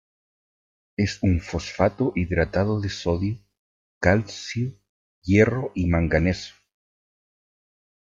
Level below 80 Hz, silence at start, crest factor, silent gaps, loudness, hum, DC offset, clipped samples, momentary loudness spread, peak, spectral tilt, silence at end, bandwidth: -44 dBFS; 1 s; 22 dB; 3.59-4.01 s, 4.89-5.22 s; -24 LUFS; none; under 0.1%; under 0.1%; 11 LU; -4 dBFS; -6.5 dB/octave; 1.65 s; 7.6 kHz